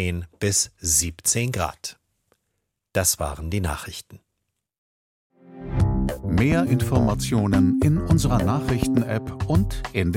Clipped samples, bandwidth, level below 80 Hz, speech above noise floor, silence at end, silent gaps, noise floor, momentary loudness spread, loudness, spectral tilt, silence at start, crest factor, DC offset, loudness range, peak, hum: under 0.1%; 16.5 kHz; -34 dBFS; 56 dB; 0 s; 4.78-5.30 s; -78 dBFS; 9 LU; -22 LUFS; -5 dB/octave; 0 s; 18 dB; under 0.1%; 8 LU; -6 dBFS; none